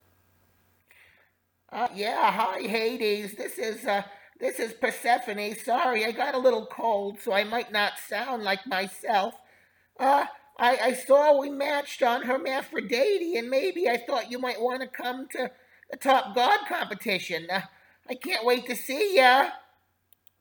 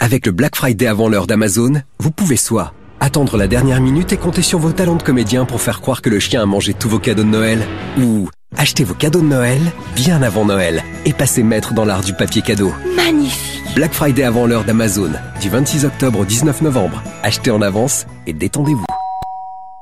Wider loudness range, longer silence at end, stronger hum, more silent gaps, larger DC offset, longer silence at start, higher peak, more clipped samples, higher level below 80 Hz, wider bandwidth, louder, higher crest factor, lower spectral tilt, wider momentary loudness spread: first, 4 LU vs 1 LU; first, 0.8 s vs 0 s; neither; neither; second, under 0.1% vs 1%; first, 1.7 s vs 0 s; second, -6 dBFS vs -2 dBFS; neither; second, -80 dBFS vs -34 dBFS; first, over 20 kHz vs 15.5 kHz; second, -26 LUFS vs -15 LUFS; first, 22 dB vs 14 dB; second, -3 dB/octave vs -5 dB/octave; first, 10 LU vs 6 LU